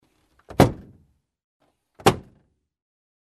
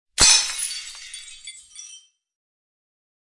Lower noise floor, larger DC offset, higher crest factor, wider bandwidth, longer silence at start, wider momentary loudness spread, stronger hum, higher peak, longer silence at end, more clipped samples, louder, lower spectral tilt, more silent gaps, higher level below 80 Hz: first, -64 dBFS vs -48 dBFS; neither; about the same, 26 dB vs 24 dB; first, 13 kHz vs 11.5 kHz; first, 0.6 s vs 0.2 s; second, 15 LU vs 26 LU; neither; about the same, -2 dBFS vs -2 dBFS; second, 1.05 s vs 1.4 s; neither; second, -22 LUFS vs -16 LUFS; first, -5.5 dB/octave vs 1.5 dB/octave; first, 1.44-1.60 s vs none; about the same, -44 dBFS vs -44 dBFS